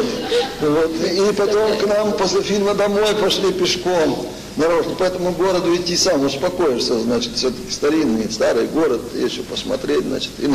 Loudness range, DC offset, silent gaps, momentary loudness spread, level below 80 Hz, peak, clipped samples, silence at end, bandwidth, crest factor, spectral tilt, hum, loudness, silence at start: 2 LU; under 0.1%; none; 5 LU; -44 dBFS; -8 dBFS; under 0.1%; 0 s; 15 kHz; 10 dB; -4 dB/octave; none; -18 LUFS; 0 s